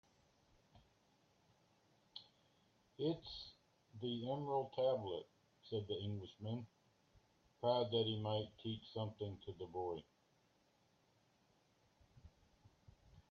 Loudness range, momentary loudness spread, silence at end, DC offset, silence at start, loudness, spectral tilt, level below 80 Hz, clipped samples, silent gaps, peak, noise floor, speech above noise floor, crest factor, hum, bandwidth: 10 LU; 19 LU; 0.1 s; under 0.1%; 0.75 s; -44 LUFS; -6 dB/octave; -76 dBFS; under 0.1%; none; -24 dBFS; -77 dBFS; 34 dB; 22 dB; none; 7 kHz